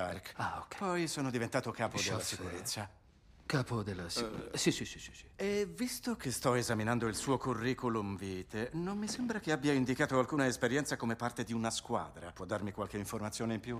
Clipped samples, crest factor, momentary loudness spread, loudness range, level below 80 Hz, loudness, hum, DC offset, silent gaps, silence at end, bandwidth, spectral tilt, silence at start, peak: under 0.1%; 20 dB; 8 LU; 3 LU; -60 dBFS; -36 LUFS; none; under 0.1%; none; 0 s; 15.5 kHz; -4.5 dB/octave; 0 s; -18 dBFS